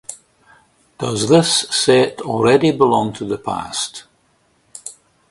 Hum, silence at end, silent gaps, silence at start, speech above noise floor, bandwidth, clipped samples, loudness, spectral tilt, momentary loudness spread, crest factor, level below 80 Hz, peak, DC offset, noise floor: none; 0.4 s; none; 0.1 s; 44 dB; 11.5 kHz; under 0.1%; -16 LUFS; -4 dB/octave; 20 LU; 18 dB; -54 dBFS; 0 dBFS; under 0.1%; -60 dBFS